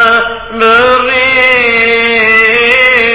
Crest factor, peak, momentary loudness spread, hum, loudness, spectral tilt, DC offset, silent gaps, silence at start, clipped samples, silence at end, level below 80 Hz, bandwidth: 8 dB; 0 dBFS; 4 LU; none; -6 LUFS; -5.5 dB/octave; under 0.1%; none; 0 s; 0.7%; 0 s; -38 dBFS; 4 kHz